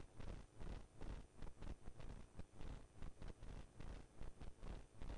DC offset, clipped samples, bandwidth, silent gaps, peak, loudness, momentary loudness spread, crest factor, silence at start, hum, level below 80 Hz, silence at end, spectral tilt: under 0.1%; under 0.1%; 11 kHz; none; -40 dBFS; -59 LUFS; 3 LU; 12 dB; 0 s; none; -56 dBFS; 0 s; -6 dB/octave